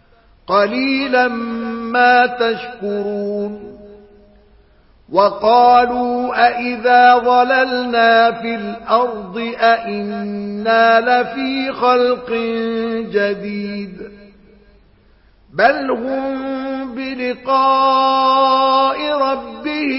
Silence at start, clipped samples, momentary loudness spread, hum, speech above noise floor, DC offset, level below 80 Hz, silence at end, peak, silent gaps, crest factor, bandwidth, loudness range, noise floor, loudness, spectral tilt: 0.5 s; under 0.1%; 13 LU; none; 35 dB; under 0.1%; -52 dBFS; 0 s; 0 dBFS; none; 16 dB; 5.8 kHz; 8 LU; -50 dBFS; -15 LUFS; -8.5 dB/octave